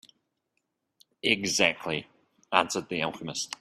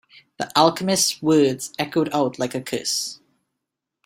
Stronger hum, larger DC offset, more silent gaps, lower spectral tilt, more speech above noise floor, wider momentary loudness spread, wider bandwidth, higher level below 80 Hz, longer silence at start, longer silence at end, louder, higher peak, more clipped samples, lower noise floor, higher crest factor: neither; neither; neither; about the same, -2.5 dB/octave vs -3.5 dB/octave; second, 51 dB vs 61 dB; about the same, 10 LU vs 9 LU; about the same, 15.5 kHz vs 16.5 kHz; about the same, -68 dBFS vs -64 dBFS; first, 1.25 s vs 0.4 s; second, 0.05 s vs 0.9 s; second, -27 LUFS vs -21 LUFS; about the same, -4 dBFS vs -2 dBFS; neither; about the same, -79 dBFS vs -82 dBFS; first, 28 dB vs 20 dB